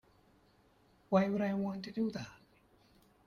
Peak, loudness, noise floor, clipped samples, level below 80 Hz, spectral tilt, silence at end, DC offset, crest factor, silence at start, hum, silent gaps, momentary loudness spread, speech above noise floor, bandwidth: -16 dBFS; -35 LUFS; -68 dBFS; under 0.1%; -72 dBFS; -7.5 dB/octave; 0.9 s; under 0.1%; 22 dB; 1.1 s; none; none; 12 LU; 34 dB; 7 kHz